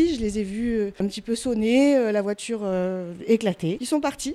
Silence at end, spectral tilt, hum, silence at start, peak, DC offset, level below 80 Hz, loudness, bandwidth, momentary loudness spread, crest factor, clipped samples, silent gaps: 0 s; -5.5 dB/octave; none; 0 s; -8 dBFS; under 0.1%; -48 dBFS; -24 LUFS; 14 kHz; 9 LU; 16 dB; under 0.1%; none